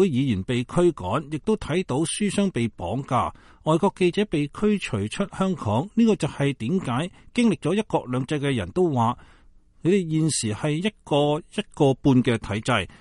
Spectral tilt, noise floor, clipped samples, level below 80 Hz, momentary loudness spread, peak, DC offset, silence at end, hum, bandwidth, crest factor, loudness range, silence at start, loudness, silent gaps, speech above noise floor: -6 dB/octave; -53 dBFS; under 0.1%; -48 dBFS; 7 LU; -8 dBFS; under 0.1%; 0.1 s; none; 11.5 kHz; 16 dB; 2 LU; 0 s; -24 LUFS; none; 30 dB